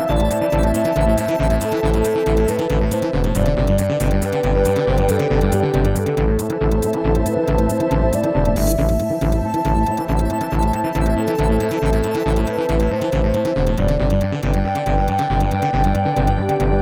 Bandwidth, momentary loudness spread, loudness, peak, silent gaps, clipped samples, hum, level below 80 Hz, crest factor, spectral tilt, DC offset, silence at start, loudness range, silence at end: 18.5 kHz; 2 LU; -18 LUFS; -4 dBFS; none; under 0.1%; none; -22 dBFS; 12 dB; -7 dB/octave; 0.2%; 0 s; 1 LU; 0 s